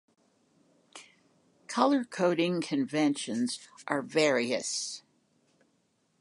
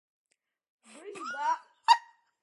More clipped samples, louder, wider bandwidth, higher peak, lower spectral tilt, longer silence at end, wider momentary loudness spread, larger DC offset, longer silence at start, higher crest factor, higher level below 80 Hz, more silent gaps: neither; about the same, -29 LUFS vs -29 LUFS; about the same, 11.5 kHz vs 11.5 kHz; about the same, -10 dBFS vs -8 dBFS; first, -4 dB/octave vs 0.5 dB/octave; first, 1.2 s vs 0.4 s; second, 14 LU vs 20 LU; neither; about the same, 0.95 s vs 1.05 s; about the same, 22 dB vs 26 dB; first, -84 dBFS vs under -90 dBFS; neither